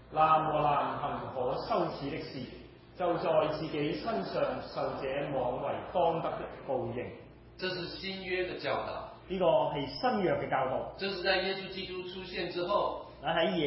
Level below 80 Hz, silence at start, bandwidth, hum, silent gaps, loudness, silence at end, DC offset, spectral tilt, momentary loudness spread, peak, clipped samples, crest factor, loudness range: -58 dBFS; 0 s; 5.8 kHz; none; none; -33 LUFS; 0 s; under 0.1%; -9 dB/octave; 11 LU; -14 dBFS; under 0.1%; 20 dB; 3 LU